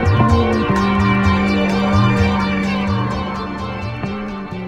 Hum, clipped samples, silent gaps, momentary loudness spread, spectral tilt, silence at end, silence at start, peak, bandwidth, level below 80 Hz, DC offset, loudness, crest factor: none; under 0.1%; none; 10 LU; -7 dB/octave; 0 s; 0 s; 0 dBFS; 10 kHz; -30 dBFS; under 0.1%; -17 LUFS; 16 dB